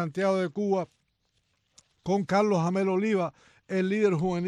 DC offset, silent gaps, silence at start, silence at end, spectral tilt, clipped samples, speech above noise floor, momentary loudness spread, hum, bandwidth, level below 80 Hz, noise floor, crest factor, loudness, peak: under 0.1%; none; 0 s; 0 s; -7 dB/octave; under 0.1%; 47 dB; 8 LU; none; 10.5 kHz; -66 dBFS; -74 dBFS; 16 dB; -27 LUFS; -12 dBFS